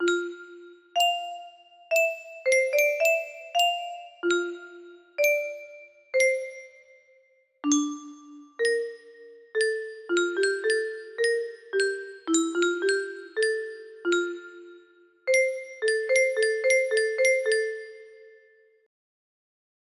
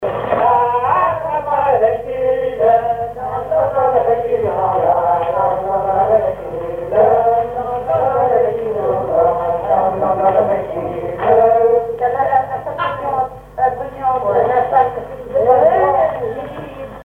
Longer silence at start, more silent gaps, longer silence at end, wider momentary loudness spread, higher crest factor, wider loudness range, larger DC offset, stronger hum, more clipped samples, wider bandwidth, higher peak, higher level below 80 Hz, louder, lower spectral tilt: about the same, 0 s vs 0 s; neither; first, 1.55 s vs 0 s; first, 17 LU vs 9 LU; about the same, 18 dB vs 16 dB; first, 4 LU vs 1 LU; neither; neither; neither; first, 15.5 kHz vs 4.1 kHz; second, -10 dBFS vs 0 dBFS; second, -76 dBFS vs -44 dBFS; second, -26 LUFS vs -16 LUFS; second, -0.5 dB/octave vs -8 dB/octave